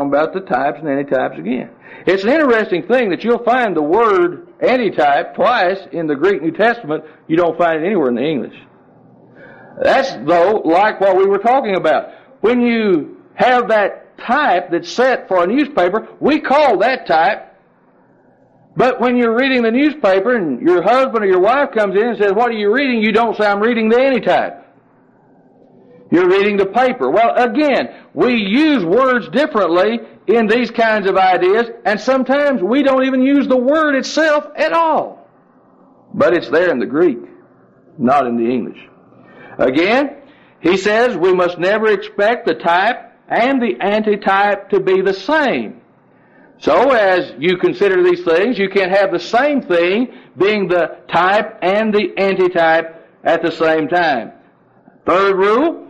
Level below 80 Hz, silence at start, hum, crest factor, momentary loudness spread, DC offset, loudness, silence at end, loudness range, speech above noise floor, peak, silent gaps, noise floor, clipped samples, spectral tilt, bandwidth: -54 dBFS; 0 s; none; 12 dB; 6 LU; under 0.1%; -14 LUFS; 0.05 s; 3 LU; 38 dB; -2 dBFS; none; -51 dBFS; under 0.1%; -6 dB/octave; 8.6 kHz